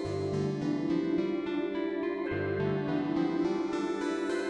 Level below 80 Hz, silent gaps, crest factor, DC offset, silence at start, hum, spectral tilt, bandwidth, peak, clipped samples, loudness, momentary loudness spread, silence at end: -62 dBFS; none; 12 dB; under 0.1%; 0 s; none; -7 dB/octave; 10.5 kHz; -18 dBFS; under 0.1%; -32 LUFS; 3 LU; 0 s